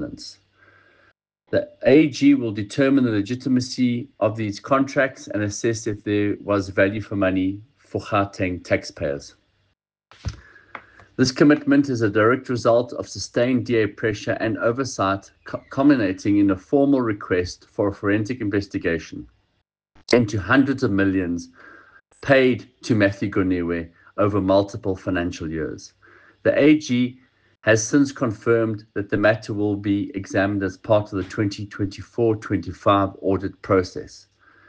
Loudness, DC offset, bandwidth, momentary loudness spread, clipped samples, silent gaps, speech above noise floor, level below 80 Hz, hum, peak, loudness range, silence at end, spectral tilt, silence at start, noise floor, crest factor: -21 LUFS; under 0.1%; 9 kHz; 12 LU; under 0.1%; none; 51 dB; -52 dBFS; none; -4 dBFS; 4 LU; 0.5 s; -6 dB/octave; 0 s; -72 dBFS; 18 dB